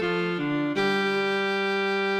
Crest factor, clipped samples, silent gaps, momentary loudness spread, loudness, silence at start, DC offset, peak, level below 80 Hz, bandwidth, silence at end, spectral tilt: 12 dB; under 0.1%; none; 3 LU; -25 LUFS; 0 s; under 0.1%; -12 dBFS; -60 dBFS; 13 kHz; 0 s; -5.5 dB/octave